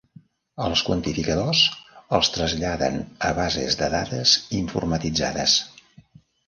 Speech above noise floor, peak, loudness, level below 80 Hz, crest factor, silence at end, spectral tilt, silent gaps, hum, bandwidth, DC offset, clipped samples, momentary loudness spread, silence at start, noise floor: 29 dB; -4 dBFS; -22 LUFS; -42 dBFS; 20 dB; 0.8 s; -3.5 dB/octave; none; none; 11 kHz; under 0.1%; under 0.1%; 8 LU; 0.55 s; -52 dBFS